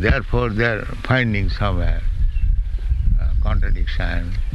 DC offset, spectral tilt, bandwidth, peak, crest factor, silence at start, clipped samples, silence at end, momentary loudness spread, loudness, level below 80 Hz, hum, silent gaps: under 0.1%; -7.5 dB/octave; 5.8 kHz; -4 dBFS; 14 dB; 0 s; under 0.1%; 0 s; 6 LU; -22 LUFS; -20 dBFS; none; none